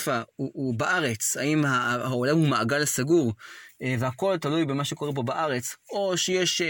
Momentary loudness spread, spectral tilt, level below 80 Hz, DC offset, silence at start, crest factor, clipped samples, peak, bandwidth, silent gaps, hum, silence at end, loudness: 8 LU; -4 dB/octave; -66 dBFS; under 0.1%; 0 s; 16 dB; under 0.1%; -10 dBFS; 17 kHz; none; none; 0 s; -26 LUFS